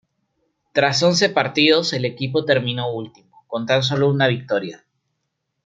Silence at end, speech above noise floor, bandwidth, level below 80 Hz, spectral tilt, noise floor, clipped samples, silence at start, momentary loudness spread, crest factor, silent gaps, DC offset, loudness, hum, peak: 0.9 s; 57 dB; 9.2 kHz; -60 dBFS; -4.5 dB/octave; -75 dBFS; under 0.1%; 0.75 s; 13 LU; 18 dB; none; under 0.1%; -19 LUFS; none; -2 dBFS